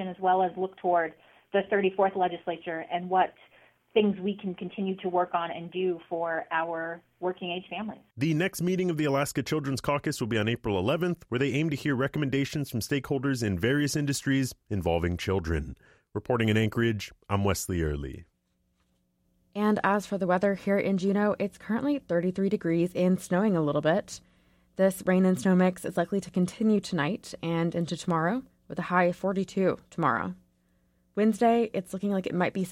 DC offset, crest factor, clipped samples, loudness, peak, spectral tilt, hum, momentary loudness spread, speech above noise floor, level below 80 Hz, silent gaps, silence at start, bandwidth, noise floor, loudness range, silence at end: under 0.1%; 18 dB; under 0.1%; -28 LUFS; -10 dBFS; -6 dB/octave; none; 9 LU; 46 dB; -52 dBFS; none; 0 s; 16 kHz; -73 dBFS; 4 LU; 0 s